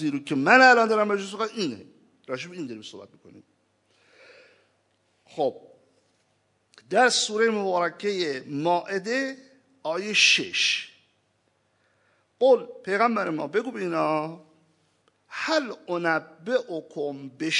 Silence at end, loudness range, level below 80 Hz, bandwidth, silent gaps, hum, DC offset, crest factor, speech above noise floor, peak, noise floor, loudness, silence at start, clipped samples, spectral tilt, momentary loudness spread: 0 s; 14 LU; -86 dBFS; 11 kHz; none; none; under 0.1%; 24 dB; 45 dB; -2 dBFS; -70 dBFS; -24 LUFS; 0 s; under 0.1%; -3 dB/octave; 18 LU